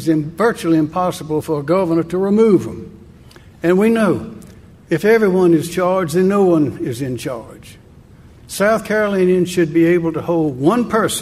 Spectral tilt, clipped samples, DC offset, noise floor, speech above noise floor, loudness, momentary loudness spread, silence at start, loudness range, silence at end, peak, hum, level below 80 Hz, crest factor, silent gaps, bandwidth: -6.5 dB/octave; under 0.1%; under 0.1%; -43 dBFS; 27 dB; -16 LUFS; 10 LU; 0 s; 3 LU; 0 s; -2 dBFS; none; -48 dBFS; 16 dB; none; 15.5 kHz